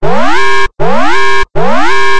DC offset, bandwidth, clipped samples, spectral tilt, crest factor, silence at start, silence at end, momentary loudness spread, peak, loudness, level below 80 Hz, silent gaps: 50%; 12 kHz; 5%; -4 dB/octave; 6 dB; 0 s; 0 s; 2 LU; 0 dBFS; -11 LUFS; -30 dBFS; none